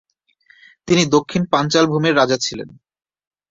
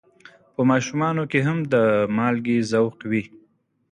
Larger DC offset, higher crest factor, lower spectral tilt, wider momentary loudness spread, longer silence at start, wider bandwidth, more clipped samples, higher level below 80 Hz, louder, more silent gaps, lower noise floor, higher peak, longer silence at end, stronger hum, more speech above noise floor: neither; about the same, 18 dB vs 16 dB; second, -4.5 dB/octave vs -6.5 dB/octave; about the same, 9 LU vs 7 LU; first, 0.85 s vs 0.6 s; second, 7.8 kHz vs 10 kHz; neither; first, -56 dBFS vs -62 dBFS; first, -17 LUFS vs -21 LUFS; neither; second, -56 dBFS vs -63 dBFS; first, -2 dBFS vs -6 dBFS; first, 0.85 s vs 0.65 s; neither; about the same, 39 dB vs 42 dB